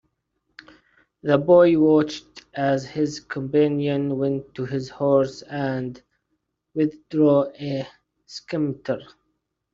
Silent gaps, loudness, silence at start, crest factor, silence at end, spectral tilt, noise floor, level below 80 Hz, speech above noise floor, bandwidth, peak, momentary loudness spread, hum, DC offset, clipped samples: none; -22 LUFS; 1.25 s; 18 dB; 0.7 s; -7 dB/octave; -75 dBFS; -62 dBFS; 54 dB; 7.6 kHz; -4 dBFS; 15 LU; none; under 0.1%; under 0.1%